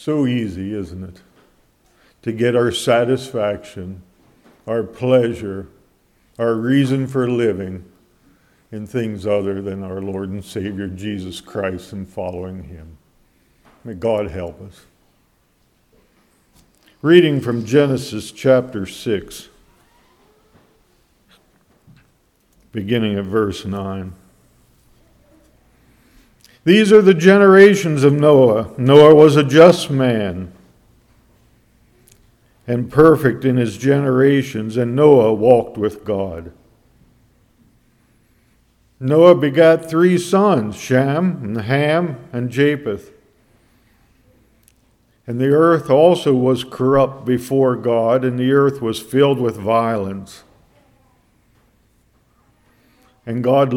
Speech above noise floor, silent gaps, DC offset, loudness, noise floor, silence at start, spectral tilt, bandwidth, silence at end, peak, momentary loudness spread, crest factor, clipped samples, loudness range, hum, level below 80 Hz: 45 dB; none; under 0.1%; -15 LUFS; -60 dBFS; 0.05 s; -6.5 dB/octave; 15 kHz; 0 s; 0 dBFS; 19 LU; 18 dB; under 0.1%; 16 LU; none; -52 dBFS